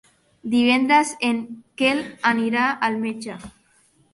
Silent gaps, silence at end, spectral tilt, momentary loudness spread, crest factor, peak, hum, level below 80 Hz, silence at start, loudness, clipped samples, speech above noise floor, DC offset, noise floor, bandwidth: none; 0.65 s; -3.5 dB/octave; 17 LU; 18 dB; -4 dBFS; none; -62 dBFS; 0.45 s; -20 LUFS; under 0.1%; 39 dB; under 0.1%; -60 dBFS; 11.5 kHz